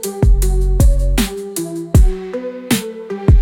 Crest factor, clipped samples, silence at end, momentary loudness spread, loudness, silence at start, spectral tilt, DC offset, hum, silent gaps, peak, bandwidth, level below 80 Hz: 12 dB; under 0.1%; 0 s; 10 LU; -17 LUFS; 0 s; -6 dB/octave; under 0.1%; none; none; -2 dBFS; 17 kHz; -16 dBFS